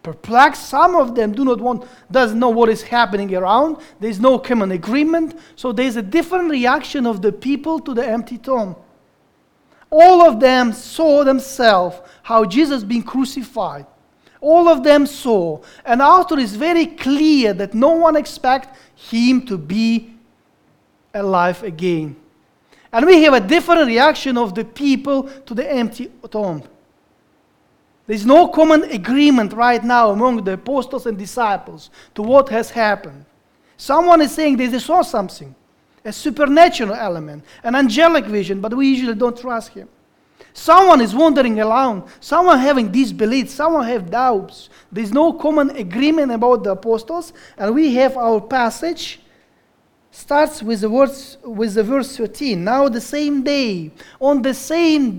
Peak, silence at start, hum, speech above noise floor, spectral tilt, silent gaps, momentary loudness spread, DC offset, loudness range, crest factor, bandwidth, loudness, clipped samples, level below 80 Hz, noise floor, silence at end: 0 dBFS; 0.05 s; none; 43 dB; -5 dB/octave; none; 13 LU; under 0.1%; 6 LU; 16 dB; 18.5 kHz; -15 LUFS; under 0.1%; -50 dBFS; -58 dBFS; 0 s